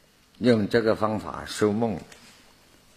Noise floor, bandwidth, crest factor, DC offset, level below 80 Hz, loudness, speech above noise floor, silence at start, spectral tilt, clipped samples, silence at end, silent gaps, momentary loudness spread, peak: -56 dBFS; 15 kHz; 20 dB; under 0.1%; -56 dBFS; -25 LUFS; 32 dB; 0.4 s; -6 dB/octave; under 0.1%; 0.95 s; none; 11 LU; -6 dBFS